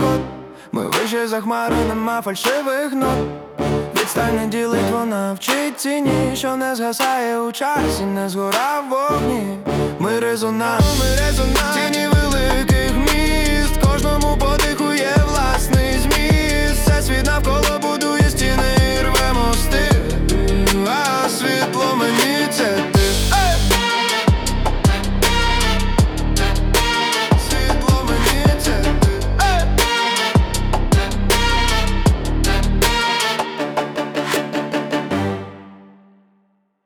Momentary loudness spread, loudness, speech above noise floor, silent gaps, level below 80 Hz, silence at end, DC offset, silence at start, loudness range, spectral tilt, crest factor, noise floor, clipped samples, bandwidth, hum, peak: 5 LU; -17 LUFS; 44 dB; none; -22 dBFS; 1.1 s; under 0.1%; 0 s; 3 LU; -4.5 dB/octave; 14 dB; -62 dBFS; under 0.1%; over 20 kHz; none; -4 dBFS